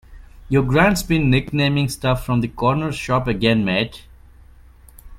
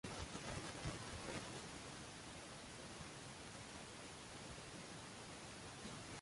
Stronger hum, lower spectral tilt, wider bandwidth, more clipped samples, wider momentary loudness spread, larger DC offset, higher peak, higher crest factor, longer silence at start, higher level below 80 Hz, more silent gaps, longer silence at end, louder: neither; first, -6 dB/octave vs -3.5 dB/octave; first, 16 kHz vs 11.5 kHz; neither; about the same, 6 LU vs 5 LU; neither; first, 0 dBFS vs -34 dBFS; about the same, 20 dB vs 20 dB; about the same, 0.1 s vs 0.05 s; first, -36 dBFS vs -64 dBFS; neither; about the same, 0 s vs 0 s; first, -19 LUFS vs -51 LUFS